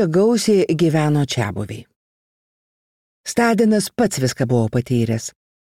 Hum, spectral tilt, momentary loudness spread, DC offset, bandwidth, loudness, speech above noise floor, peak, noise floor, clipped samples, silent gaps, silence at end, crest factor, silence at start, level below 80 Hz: none; -6 dB/octave; 13 LU; 0.2%; 16.5 kHz; -18 LUFS; over 73 dB; -4 dBFS; under -90 dBFS; under 0.1%; 1.96-3.24 s; 0.35 s; 14 dB; 0 s; -54 dBFS